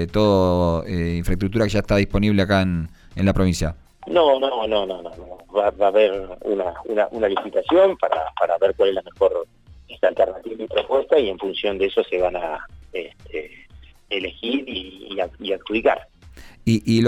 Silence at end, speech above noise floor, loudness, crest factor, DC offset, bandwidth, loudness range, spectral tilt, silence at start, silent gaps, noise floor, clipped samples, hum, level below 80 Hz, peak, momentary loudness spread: 0 s; 26 dB; -21 LUFS; 16 dB; under 0.1%; 13.5 kHz; 6 LU; -6.5 dB/octave; 0 s; none; -46 dBFS; under 0.1%; none; -38 dBFS; -4 dBFS; 14 LU